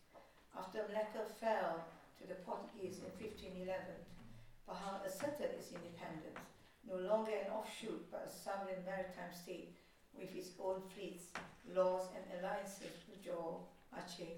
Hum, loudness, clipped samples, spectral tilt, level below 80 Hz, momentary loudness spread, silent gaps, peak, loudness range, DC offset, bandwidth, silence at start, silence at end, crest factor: none; -46 LUFS; under 0.1%; -5 dB/octave; -72 dBFS; 17 LU; none; -26 dBFS; 4 LU; under 0.1%; 18 kHz; 0.1 s; 0 s; 20 dB